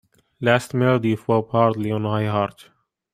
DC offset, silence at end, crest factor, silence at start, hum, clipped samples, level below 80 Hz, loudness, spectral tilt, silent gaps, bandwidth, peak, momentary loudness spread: under 0.1%; 0.65 s; 20 dB; 0.4 s; none; under 0.1%; -60 dBFS; -21 LUFS; -7 dB/octave; none; 14.5 kHz; -2 dBFS; 6 LU